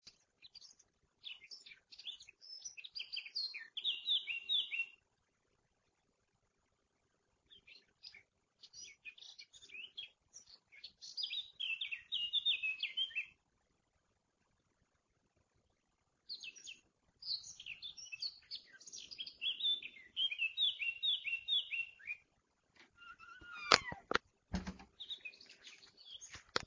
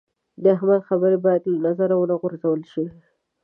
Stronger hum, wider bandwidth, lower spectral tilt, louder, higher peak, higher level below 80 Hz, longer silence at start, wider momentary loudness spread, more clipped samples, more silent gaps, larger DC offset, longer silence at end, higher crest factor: neither; first, 7.8 kHz vs 3.5 kHz; second, -1 dB/octave vs -11 dB/octave; second, -39 LUFS vs -21 LUFS; about the same, -8 dBFS vs -6 dBFS; about the same, -68 dBFS vs -70 dBFS; second, 0.05 s vs 0.4 s; first, 22 LU vs 8 LU; neither; neither; neither; second, 0 s vs 0.55 s; first, 36 dB vs 16 dB